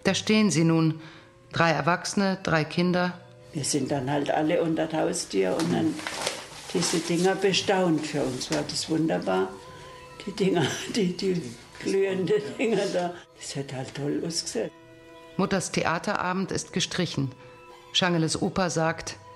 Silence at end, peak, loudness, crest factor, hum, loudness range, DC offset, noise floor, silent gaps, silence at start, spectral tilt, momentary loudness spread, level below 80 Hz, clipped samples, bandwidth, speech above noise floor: 0 s; -6 dBFS; -26 LUFS; 20 dB; none; 3 LU; under 0.1%; -48 dBFS; none; 0.05 s; -4.5 dB/octave; 12 LU; -58 dBFS; under 0.1%; 13 kHz; 23 dB